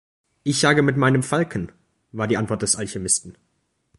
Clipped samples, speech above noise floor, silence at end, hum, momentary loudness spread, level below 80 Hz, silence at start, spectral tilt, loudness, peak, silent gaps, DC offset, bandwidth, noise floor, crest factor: under 0.1%; 50 dB; 0.65 s; none; 13 LU; -52 dBFS; 0.45 s; -4 dB/octave; -21 LUFS; -4 dBFS; none; under 0.1%; 11.5 kHz; -71 dBFS; 20 dB